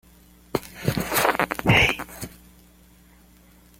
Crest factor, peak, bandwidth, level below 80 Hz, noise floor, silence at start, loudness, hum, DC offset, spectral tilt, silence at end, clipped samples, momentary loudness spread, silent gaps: 24 dB; -2 dBFS; 17 kHz; -44 dBFS; -53 dBFS; 0.55 s; -22 LUFS; none; under 0.1%; -4 dB/octave; 1.5 s; under 0.1%; 19 LU; none